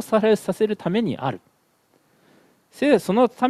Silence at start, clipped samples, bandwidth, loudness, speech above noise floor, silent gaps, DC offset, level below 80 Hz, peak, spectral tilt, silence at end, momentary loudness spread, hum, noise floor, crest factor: 0 s; under 0.1%; 14.5 kHz; -21 LUFS; 43 dB; none; under 0.1%; -66 dBFS; -4 dBFS; -6.5 dB/octave; 0 s; 10 LU; none; -63 dBFS; 18 dB